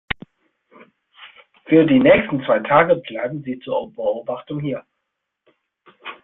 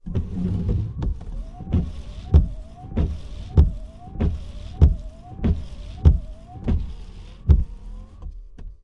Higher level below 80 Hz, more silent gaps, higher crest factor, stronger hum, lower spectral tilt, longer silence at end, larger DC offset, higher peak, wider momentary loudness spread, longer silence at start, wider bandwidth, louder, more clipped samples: second, -52 dBFS vs -26 dBFS; neither; about the same, 20 dB vs 22 dB; neither; first, -11 dB/octave vs -9.5 dB/octave; about the same, 0.1 s vs 0.05 s; neither; about the same, -2 dBFS vs 0 dBFS; second, 16 LU vs 21 LU; first, 1.2 s vs 0.05 s; second, 4.1 kHz vs 5.8 kHz; first, -18 LUFS vs -24 LUFS; neither